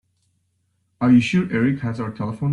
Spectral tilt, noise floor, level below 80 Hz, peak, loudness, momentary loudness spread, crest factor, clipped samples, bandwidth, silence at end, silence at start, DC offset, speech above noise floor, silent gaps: -7.5 dB/octave; -69 dBFS; -56 dBFS; -6 dBFS; -20 LUFS; 11 LU; 16 dB; under 0.1%; 10.5 kHz; 0 s; 1 s; under 0.1%; 50 dB; none